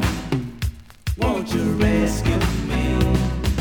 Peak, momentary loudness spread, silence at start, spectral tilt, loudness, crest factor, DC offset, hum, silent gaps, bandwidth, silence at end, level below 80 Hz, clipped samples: -6 dBFS; 10 LU; 0 s; -6 dB/octave; -22 LUFS; 16 dB; under 0.1%; none; none; over 20 kHz; 0 s; -26 dBFS; under 0.1%